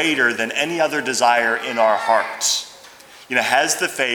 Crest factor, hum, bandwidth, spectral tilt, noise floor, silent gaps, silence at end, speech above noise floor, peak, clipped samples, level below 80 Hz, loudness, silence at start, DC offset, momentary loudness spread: 18 dB; none; over 20 kHz; -1 dB/octave; -43 dBFS; none; 0 s; 25 dB; -2 dBFS; under 0.1%; -70 dBFS; -18 LUFS; 0 s; under 0.1%; 5 LU